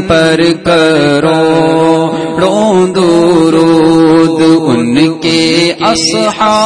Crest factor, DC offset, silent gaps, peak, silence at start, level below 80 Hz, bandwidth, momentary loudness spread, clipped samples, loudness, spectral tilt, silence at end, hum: 8 dB; under 0.1%; none; 0 dBFS; 0 s; -40 dBFS; 10 kHz; 3 LU; 0.2%; -8 LUFS; -5 dB/octave; 0 s; none